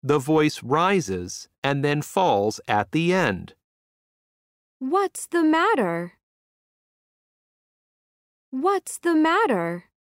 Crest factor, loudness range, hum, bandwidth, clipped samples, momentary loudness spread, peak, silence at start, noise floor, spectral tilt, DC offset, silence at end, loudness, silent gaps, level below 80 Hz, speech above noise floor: 20 dB; 5 LU; none; 16 kHz; under 0.1%; 11 LU; -4 dBFS; 0.05 s; under -90 dBFS; -5.5 dB/octave; under 0.1%; 0.3 s; -22 LUFS; 1.58-1.62 s, 3.64-4.80 s, 6.23-8.52 s; -64 dBFS; over 68 dB